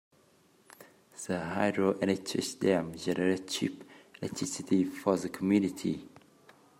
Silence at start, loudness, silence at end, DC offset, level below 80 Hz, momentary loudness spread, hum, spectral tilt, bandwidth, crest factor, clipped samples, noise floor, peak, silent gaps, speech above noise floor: 0.8 s; -31 LUFS; 0.7 s; under 0.1%; -72 dBFS; 12 LU; none; -5 dB/octave; 16 kHz; 20 dB; under 0.1%; -65 dBFS; -12 dBFS; none; 34 dB